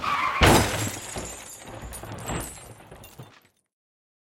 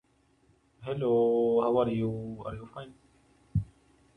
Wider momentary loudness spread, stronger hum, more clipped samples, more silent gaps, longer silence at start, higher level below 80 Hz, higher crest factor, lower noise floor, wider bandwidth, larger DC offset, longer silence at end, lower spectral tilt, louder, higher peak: first, 27 LU vs 20 LU; neither; neither; neither; second, 0 s vs 0.8 s; first, -38 dBFS vs -52 dBFS; first, 24 dB vs 18 dB; second, -56 dBFS vs -67 dBFS; first, 17 kHz vs 3.9 kHz; neither; first, 1.15 s vs 0.5 s; second, -4 dB/octave vs -9.5 dB/octave; first, -24 LUFS vs -29 LUFS; first, -2 dBFS vs -14 dBFS